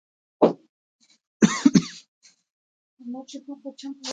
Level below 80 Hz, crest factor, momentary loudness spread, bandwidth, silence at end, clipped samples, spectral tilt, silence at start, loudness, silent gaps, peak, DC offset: -66 dBFS; 24 dB; 20 LU; 9.4 kHz; 0 s; under 0.1%; -5.5 dB/octave; 0.4 s; -21 LUFS; 0.69-0.99 s, 1.27-1.40 s, 2.08-2.21 s, 2.50-2.97 s; -2 dBFS; under 0.1%